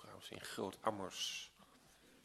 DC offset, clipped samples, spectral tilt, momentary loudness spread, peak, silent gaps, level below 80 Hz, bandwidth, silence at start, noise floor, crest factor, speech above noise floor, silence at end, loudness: under 0.1%; under 0.1%; -2.5 dB/octave; 12 LU; -22 dBFS; none; -78 dBFS; 15.5 kHz; 0 s; -67 dBFS; 26 dB; 22 dB; 0 s; -44 LUFS